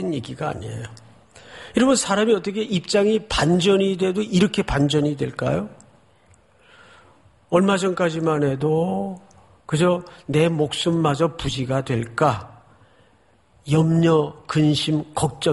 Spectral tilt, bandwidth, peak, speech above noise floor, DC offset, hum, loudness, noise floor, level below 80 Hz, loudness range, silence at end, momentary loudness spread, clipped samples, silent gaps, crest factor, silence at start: -5.5 dB/octave; 11.5 kHz; -4 dBFS; 38 dB; under 0.1%; none; -21 LUFS; -58 dBFS; -46 dBFS; 4 LU; 0 s; 10 LU; under 0.1%; none; 18 dB; 0 s